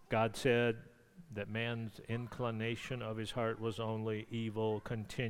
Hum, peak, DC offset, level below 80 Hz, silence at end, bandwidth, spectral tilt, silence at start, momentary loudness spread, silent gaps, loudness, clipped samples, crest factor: none; -18 dBFS; under 0.1%; -62 dBFS; 0 s; 16 kHz; -6 dB/octave; 0 s; 10 LU; none; -38 LUFS; under 0.1%; 20 dB